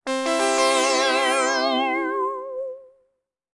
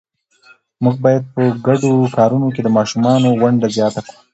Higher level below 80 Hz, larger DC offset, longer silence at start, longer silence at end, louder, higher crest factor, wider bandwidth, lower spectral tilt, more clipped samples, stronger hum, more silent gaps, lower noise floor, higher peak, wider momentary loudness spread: second, -70 dBFS vs -56 dBFS; neither; second, 0.05 s vs 0.8 s; first, 0.7 s vs 0.3 s; second, -21 LUFS vs -15 LUFS; about the same, 14 dB vs 14 dB; first, 11.5 kHz vs 8.2 kHz; second, 0.5 dB/octave vs -7 dB/octave; neither; neither; neither; first, -72 dBFS vs -50 dBFS; second, -8 dBFS vs 0 dBFS; first, 12 LU vs 5 LU